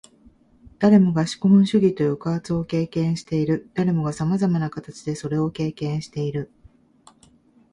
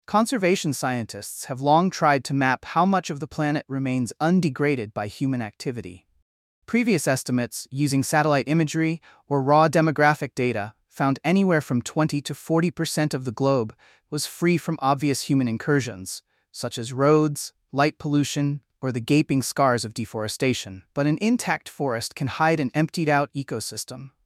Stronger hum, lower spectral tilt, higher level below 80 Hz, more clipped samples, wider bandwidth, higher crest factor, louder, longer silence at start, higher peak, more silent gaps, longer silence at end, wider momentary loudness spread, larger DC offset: neither; first, -7.5 dB/octave vs -5.5 dB/octave; first, -54 dBFS vs -62 dBFS; neither; second, 11 kHz vs 15.5 kHz; about the same, 18 dB vs 18 dB; about the same, -22 LUFS vs -23 LUFS; first, 0.8 s vs 0.1 s; about the same, -4 dBFS vs -4 dBFS; second, none vs 6.22-6.62 s; first, 1.25 s vs 0.2 s; about the same, 12 LU vs 11 LU; neither